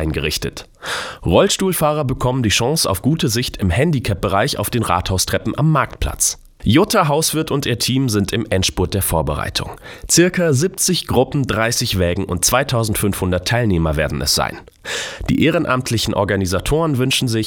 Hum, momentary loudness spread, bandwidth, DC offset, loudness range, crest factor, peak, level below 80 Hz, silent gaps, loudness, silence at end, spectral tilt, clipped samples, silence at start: none; 8 LU; 19 kHz; under 0.1%; 1 LU; 18 dB; 0 dBFS; -34 dBFS; none; -17 LUFS; 0 s; -4 dB/octave; under 0.1%; 0 s